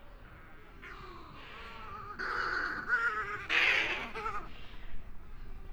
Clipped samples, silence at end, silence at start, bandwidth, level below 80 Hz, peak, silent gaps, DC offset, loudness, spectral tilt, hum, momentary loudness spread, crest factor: under 0.1%; 0 s; 0 s; over 20 kHz; -50 dBFS; -14 dBFS; none; under 0.1%; -32 LUFS; -3 dB/octave; none; 26 LU; 22 dB